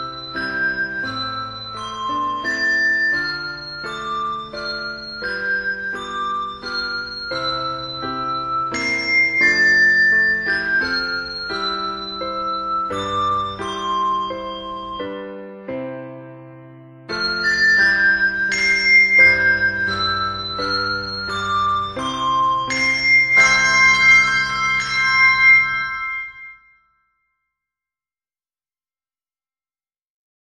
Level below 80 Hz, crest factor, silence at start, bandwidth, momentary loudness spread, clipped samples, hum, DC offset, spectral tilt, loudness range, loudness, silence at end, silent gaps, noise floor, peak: -50 dBFS; 18 dB; 0 s; 11 kHz; 17 LU; under 0.1%; none; under 0.1%; -2 dB/octave; 11 LU; -17 LUFS; 4 s; none; under -90 dBFS; -2 dBFS